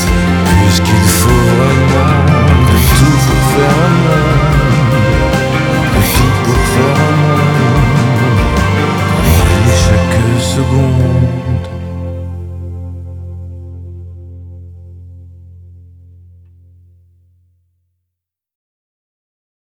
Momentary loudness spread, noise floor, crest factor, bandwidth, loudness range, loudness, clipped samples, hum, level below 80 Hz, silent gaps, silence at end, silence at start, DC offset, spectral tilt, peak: 18 LU; -78 dBFS; 12 dB; over 20 kHz; 18 LU; -10 LUFS; under 0.1%; none; -22 dBFS; none; 4.1 s; 0 s; under 0.1%; -5.5 dB/octave; 0 dBFS